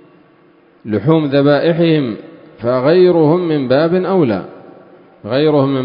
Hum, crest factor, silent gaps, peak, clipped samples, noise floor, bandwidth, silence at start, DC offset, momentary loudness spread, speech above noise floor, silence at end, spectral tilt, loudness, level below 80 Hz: none; 14 dB; none; 0 dBFS; under 0.1%; -48 dBFS; 5.2 kHz; 0.85 s; under 0.1%; 13 LU; 36 dB; 0 s; -11.5 dB/octave; -13 LUFS; -54 dBFS